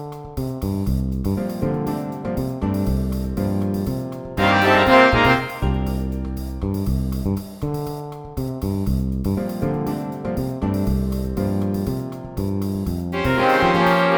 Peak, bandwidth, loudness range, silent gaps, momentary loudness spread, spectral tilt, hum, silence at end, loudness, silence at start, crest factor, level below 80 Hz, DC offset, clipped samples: -2 dBFS; over 20 kHz; 7 LU; none; 12 LU; -6.5 dB/octave; none; 0 s; -21 LUFS; 0 s; 20 dB; -30 dBFS; under 0.1%; under 0.1%